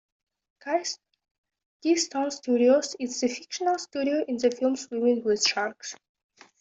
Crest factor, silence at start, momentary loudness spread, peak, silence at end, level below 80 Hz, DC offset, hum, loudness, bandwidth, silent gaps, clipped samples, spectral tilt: 18 dB; 0.65 s; 12 LU; -10 dBFS; 0.65 s; -74 dBFS; under 0.1%; none; -26 LUFS; 8.2 kHz; 1.31-1.44 s, 1.66-1.80 s; under 0.1%; -2 dB/octave